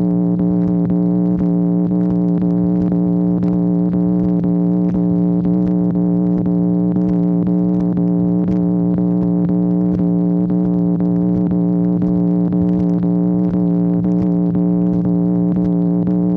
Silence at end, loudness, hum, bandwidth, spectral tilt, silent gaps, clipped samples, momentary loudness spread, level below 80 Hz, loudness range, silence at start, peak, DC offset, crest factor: 0 s; -16 LUFS; none; 2.1 kHz; -13 dB/octave; none; under 0.1%; 0 LU; -42 dBFS; 0 LU; 0 s; -4 dBFS; under 0.1%; 10 dB